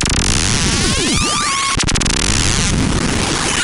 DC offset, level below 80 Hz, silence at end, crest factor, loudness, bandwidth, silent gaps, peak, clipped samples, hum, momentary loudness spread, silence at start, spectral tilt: under 0.1%; -22 dBFS; 0 s; 12 dB; -14 LUFS; 16.5 kHz; none; -4 dBFS; under 0.1%; none; 2 LU; 0 s; -2.5 dB/octave